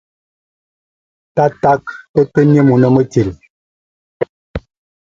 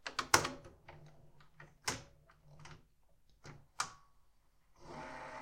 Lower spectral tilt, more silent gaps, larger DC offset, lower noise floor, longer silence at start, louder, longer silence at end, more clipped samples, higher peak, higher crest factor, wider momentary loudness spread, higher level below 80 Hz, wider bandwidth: first, -9 dB/octave vs -1.5 dB/octave; first, 2.09-2.14 s, 3.50-4.20 s, 4.29-4.54 s vs none; neither; first, under -90 dBFS vs -68 dBFS; first, 1.35 s vs 0.05 s; first, -14 LUFS vs -38 LUFS; first, 0.45 s vs 0 s; neither; first, 0 dBFS vs -8 dBFS; second, 16 dB vs 36 dB; second, 15 LU vs 27 LU; first, -42 dBFS vs -66 dBFS; second, 7.6 kHz vs 16 kHz